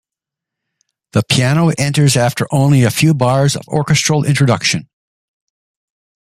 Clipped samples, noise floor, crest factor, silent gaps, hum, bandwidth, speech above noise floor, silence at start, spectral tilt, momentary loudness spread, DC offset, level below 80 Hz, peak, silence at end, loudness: under 0.1%; -84 dBFS; 14 dB; none; none; 15 kHz; 72 dB; 1.15 s; -5 dB/octave; 5 LU; under 0.1%; -50 dBFS; 0 dBFS; 1.45 s; -13 LUFS